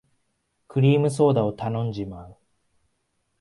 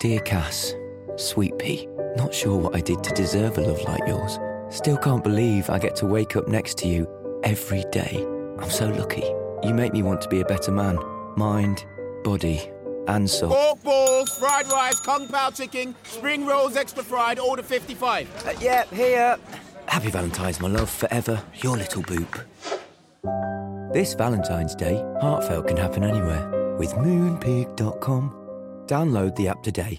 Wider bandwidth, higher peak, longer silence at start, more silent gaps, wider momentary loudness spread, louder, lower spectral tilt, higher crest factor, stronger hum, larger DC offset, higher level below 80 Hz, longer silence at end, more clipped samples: second, 11.5 kHz vs 16.5 kHz; about the same, -6 dBFS vs -6 dBFS; first, 0.75 s vs 0 s; neither; first, 15 LU vs 10 LU; about the same, -22 LUFS vs -24 LUFS; first, -8 dB/octave vs -5 dB/octave; about the same, 18 dB vs 18 dB; neither; neither; second, -56 dBFS vs -44 dBFS; first, 1.1 s vs 0 s; neither